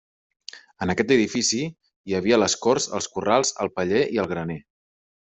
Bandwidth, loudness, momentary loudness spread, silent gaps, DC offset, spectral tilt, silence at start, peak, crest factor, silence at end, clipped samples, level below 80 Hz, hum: 8.4 kHz; -23 LUFS; 20 LU; 1.96-2.04 s; under 0.1%; -3.5 dB/octave; 0.55 s; -4 dBFS; 20 dB; 0.65 s; under 0.1%; -62 dBFS; none